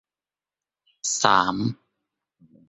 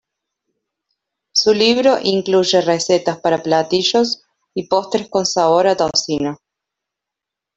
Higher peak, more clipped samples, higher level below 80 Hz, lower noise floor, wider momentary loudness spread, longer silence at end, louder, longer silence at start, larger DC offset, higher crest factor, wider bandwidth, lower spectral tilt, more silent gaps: about the same, -2 dBFS vs -2 dBFS; neither; about the same, -62 dBFS vs -58 dBFS; first, under -90 dBFS vs -84 dBFS; first, 12 LU vs 9 LU; second, 0.95 s vs 1.2 s; second, -22 LUFS vs -16 LUFS; second, 1.05 s vs 1.35 s; neither; first, 24 dB vs 16 dB; about the same, 8.4 kHz vs 8.2 kHz; about the same, -3 dB/octave vs -3.5 dB/octave; neither